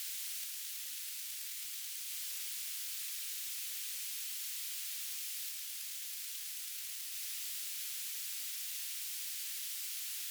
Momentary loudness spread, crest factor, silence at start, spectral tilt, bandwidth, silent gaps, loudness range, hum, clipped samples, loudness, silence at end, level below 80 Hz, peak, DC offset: 2 LU; 14 dB; 0 s; 10 dB/octave; over 20 kHz; none; 1 LU; none; under 0.1%; -38 LUFS; 0 s; under -90 dBFS; -28 dBFS; under 0.1%